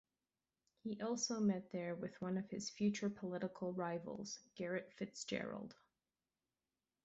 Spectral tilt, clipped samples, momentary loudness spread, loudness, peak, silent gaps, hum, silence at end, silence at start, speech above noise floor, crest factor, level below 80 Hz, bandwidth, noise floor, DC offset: -5.5 dB/octave; under 0.1%; 10 LU; -44 LUFS; -26 dBFS; none; none; 1.3 s; 0.85 s; over 47 dB; 18 dB; -82 dBFS; 7.6 kHz; under -90 dBFS; under 0.1%